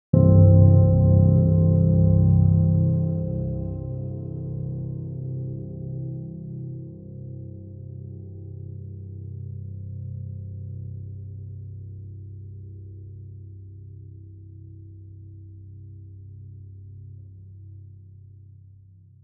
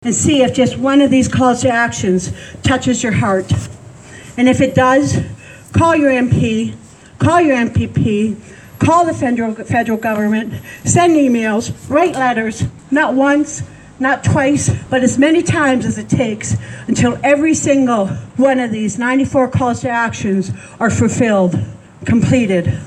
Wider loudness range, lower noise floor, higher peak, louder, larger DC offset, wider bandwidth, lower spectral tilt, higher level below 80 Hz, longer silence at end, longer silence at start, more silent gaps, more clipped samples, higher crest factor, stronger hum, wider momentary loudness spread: first, 24 LU vs 2 LU; first, -50 dBFS vs -36 dBFS; about the same, -2 dBFS vs 0 dBFS; second, -21 LUFS vs -14 LUFS; neither; second, 1.4 kHz vs 12 kHz; first, -17.5 dB/octave vs -5.5 dB/octave; about the same, -42 dBFS vs -42 dBFS; first, 1.4 s vs 0 s; first, 0.15 s vs 0 s; neither; neither; first, 20 dB vs 14 dB; neither; first, 27 LU vs 9 LU